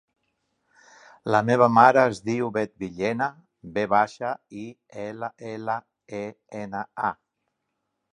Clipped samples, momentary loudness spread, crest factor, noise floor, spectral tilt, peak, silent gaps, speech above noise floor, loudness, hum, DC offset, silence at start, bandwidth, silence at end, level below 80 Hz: under 0.1%; 20 LU; 24 dB; -79 dBFS; -6.5 dB/octave; -2 dBFS; none; 55 dB; -24 LUFS; none; under 0.1%; 1.25 s; 11 kHz; 1 s; -64 dBFS